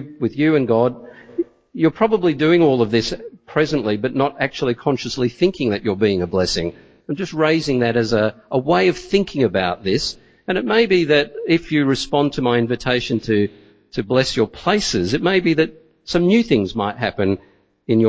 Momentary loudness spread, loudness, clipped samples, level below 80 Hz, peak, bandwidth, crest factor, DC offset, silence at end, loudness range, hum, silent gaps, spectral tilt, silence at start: 10 LU; -19 LUFS; under 0.1%; -46 dBFS; -2 dBFS; 8 kHz; 16 dB; under 0.1%; 0 s; 2 LU; none; none; -5.5 dB/octave; 0 s